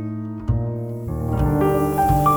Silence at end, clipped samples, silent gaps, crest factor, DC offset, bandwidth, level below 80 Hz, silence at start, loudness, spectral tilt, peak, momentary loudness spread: 0 s; under 0.1%; none; 16 dB; under 0.1%; over 20 kHz; -30 dBFS; 0 s; -22 LUFS; -8 dB/octave; -4 dBFS; 10 LU